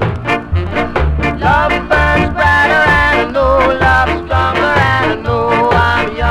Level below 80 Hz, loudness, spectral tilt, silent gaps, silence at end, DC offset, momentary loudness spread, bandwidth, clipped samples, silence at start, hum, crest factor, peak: -22 dBFS; -12 LUFS; -6.5 dB/octave; none; 0 s; under 0.1%; 7 LU; 13 kHz; under 0.1%; 0 s; none; 12 dB; 0 dBFS